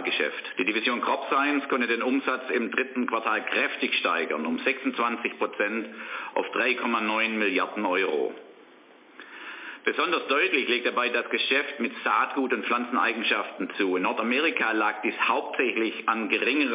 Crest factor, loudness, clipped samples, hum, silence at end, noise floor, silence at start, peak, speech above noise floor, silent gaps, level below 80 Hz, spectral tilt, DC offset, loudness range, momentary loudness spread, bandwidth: 18 dB; -25 LUFS; under 0.1%; none; 0 s; -53 dBFS; 0 s; -10 dBFS; 27 dB; none; -88 dBFS; 0 dB/octave; under 0.1%; 2 LU; 6 LU; 3.9 kHz